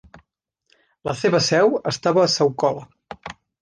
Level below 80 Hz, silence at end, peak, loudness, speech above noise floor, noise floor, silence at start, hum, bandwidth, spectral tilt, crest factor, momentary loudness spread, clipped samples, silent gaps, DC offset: -58 dBFS; 0.3 s; -6 dBFS; -19 LUFS; 52 dB; -71 dBFS; 1.05 s; none; 10 kHz; -4.5 dB/octave; 16 dB; 20 LU; under 0.1%; none; under 0.1%